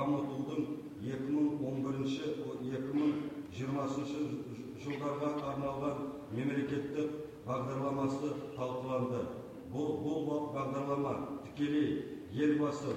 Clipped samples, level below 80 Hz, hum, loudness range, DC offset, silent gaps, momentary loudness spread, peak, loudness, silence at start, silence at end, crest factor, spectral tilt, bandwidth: under 0.1%; -68 dBFS; none; 2 LU; under 0.1%; none; 8 LU; -20 dBFS; -37 LUFS; 0 s; 0 s; 16 dB; -7.5 dB/octave; 9.8 kHz